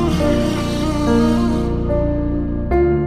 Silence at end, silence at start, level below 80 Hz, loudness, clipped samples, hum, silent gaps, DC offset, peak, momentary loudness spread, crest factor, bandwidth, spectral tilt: 0 s; 0 s; -24 dBFS; -18 LUFS; under 0.1%; none; none; under 0.1%; -4 dBFS; 5 LU; 12 dB; 15 kHz; -7 dB/octave